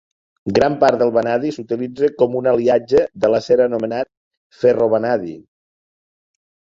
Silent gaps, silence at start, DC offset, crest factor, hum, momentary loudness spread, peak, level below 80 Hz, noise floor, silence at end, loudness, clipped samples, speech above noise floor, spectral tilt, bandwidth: 4.17-4.31 s, 4.37-4.50 s; 0.45 s; under 0.1%; 16 dB; none; 9 LU; -2 dBFS; -54 dBFS; under -90 dBFS; 1.3 s; -17 LUFS; under 0.1%; over 74 dB; -6.5 dB/octave; 7.6 kHz